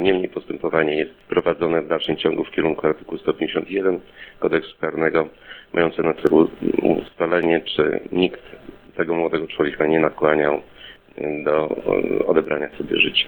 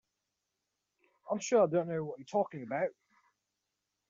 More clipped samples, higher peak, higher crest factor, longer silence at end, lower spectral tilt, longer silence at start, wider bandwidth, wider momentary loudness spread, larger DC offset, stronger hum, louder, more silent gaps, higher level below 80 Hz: neither; first, 0 dBFS vs -16 dBFS; about the same, 20 dB vs 20 dB; second, 0 s vs 1.2 s; first, -8 dB/octave vs -6 dB/octave; second, 0 s vs 1.25 s; first, 19.5 kHz vs 7.4 kHz; about the same, 9 LU vs 10 LU; neither; neither; first, -21 LUFS vs -33 LUFS; neither; first, -52 dBFS vs -78 dBFS